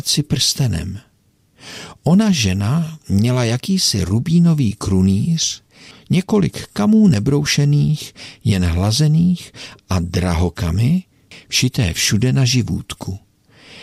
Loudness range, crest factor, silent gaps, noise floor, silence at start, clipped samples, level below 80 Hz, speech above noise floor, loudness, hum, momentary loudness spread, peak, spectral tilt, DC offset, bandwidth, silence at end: 2 LU; 12 dB; none; -57 dBFS; 0.05 s; under 0.1%; -38 dBFS; 41 dB; -17 LUFS; none; 13 LU; -4 dBFS; -5 dB/octave; under 0.1%; 15 kHz; 0 s